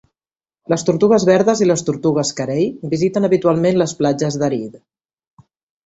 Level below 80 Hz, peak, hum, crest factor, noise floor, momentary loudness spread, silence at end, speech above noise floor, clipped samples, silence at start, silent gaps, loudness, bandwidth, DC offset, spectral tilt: -56 dBFS; -2 dBFS; none; 16 dB; under -90 dBFS; 7 LU; 1.1 s; over 74 dB; under 0.1%; 0.7 s; none; -16 LUFS; 8 kHz; under 0.1%; -5.5 dB/octave